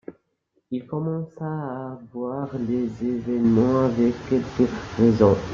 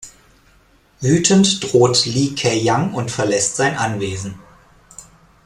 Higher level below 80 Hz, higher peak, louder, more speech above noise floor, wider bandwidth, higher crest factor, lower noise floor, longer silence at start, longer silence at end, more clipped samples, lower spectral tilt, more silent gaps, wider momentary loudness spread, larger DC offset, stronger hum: about the same, -50 dBFS vs -50 dBFS; about the same, -2 dBFS vs 0 dBFS; second, -23 LUFS vs -16 LUFS; first, 48 dB vs 37 dB; second, 7.2 kHz vs 13 kHz; about the same, 20 dB vs 18 dB; first, -71 dBFS vs -53 dBFS; about the same, 0.1 s vs 0 s; second, 0 s vs 0.45 s; neither; first, -8.5 dB/octave vs -4 dB/octave; neither; about the same, 13 LU vs 11 LU; neither; neither